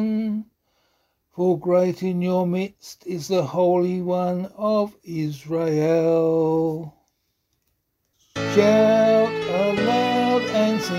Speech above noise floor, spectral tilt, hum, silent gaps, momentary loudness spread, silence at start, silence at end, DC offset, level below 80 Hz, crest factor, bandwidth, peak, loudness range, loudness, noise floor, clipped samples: 52 dB; -6.5 dB/octave; none; none; 13 LU; 0 s; 0 s; under 0.1%; -62 dBFS; 18 dB; 16 kHz; -2 dBFS; 4 LU; -21 LUFS; -72 dBFS; under 0.1%